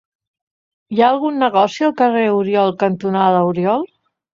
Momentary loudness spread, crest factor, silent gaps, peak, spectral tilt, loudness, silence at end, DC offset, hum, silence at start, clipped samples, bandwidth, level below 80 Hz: 5 LU; 16 dB; none; -2 dBFS; -7 dB/octave; -16 LUFS; 0.45 s; under 0.1%; none; 0.9 s; under 0.1%; 7.6 kHz; -64 dBFS